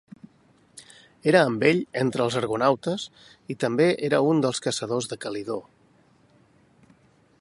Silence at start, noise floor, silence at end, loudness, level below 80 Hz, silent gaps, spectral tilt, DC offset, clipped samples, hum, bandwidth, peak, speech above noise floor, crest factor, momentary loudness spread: 0.75 s; -60 dBFS; 1.8 s; -24 LUFS; -66 dBFS; none; -5 dB/octave; under 0.1%; under 0.1%; none; 11.5 kHz; -4 dBFS; 36 dB; 22 dB; 12 LU